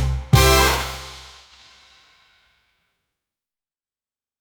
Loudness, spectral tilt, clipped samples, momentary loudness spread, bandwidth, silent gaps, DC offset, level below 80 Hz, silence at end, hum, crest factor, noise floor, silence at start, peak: -17 LUFS; -4 dB/octave; under 0.1%; 23 LU; over 20 kHz; none; under 0.1%; -30 dBFS; 3.2 s; none; 22 dB; under -90 dBFS; 0 s; -2 dBFS